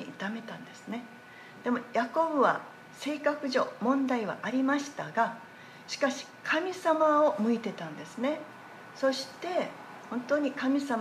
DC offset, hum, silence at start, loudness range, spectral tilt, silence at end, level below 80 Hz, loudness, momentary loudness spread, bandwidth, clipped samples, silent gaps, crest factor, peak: under 0.1%; none; 0 s; 3 LU; -4.5 dB/octave; 0 s; -82 dBFS; -30 LUFS; 19 LU; 14.5 kHz; under 0.1%; none; 18 dB; -12 dBFS